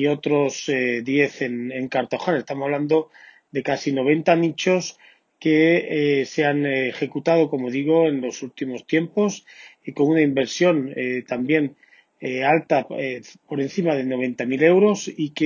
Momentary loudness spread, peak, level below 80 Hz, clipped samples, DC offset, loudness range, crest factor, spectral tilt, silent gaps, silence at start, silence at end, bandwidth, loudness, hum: 11 LU; -2 dBFS; -70 dBFS; under 0.1%; under 0.1%; 3 LU; 20 dB; -5.5 dB/octave; none; 0 s; 0 s; 7.4 kHz; -21 LUFS; none